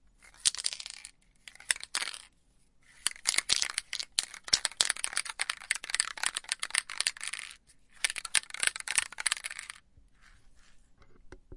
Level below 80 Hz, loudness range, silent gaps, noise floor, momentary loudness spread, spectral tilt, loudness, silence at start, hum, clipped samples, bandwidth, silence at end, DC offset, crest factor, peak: -64 dBFS; 3 LU; none; -65 dBFS; 13 LU; 2.5 dB/octave; -31 LUFS; 0.4 s; none; under 0.1%; 11.5 kHz; 0 s; under 0.1%; 34 dB; -2 dBFS